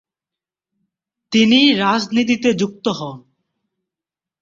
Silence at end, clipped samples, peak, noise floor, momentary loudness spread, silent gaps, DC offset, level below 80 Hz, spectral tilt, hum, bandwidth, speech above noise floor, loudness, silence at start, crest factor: 1.25 s; under 0.1%; -2 dBFS; -88 dBFS; 11 LU; none; under 0.1%; -60 dBFS; -4.5 dB/octave; none; 7.6 kHz; 72 dB; -16 LUFS; 1.3 s; 18 dB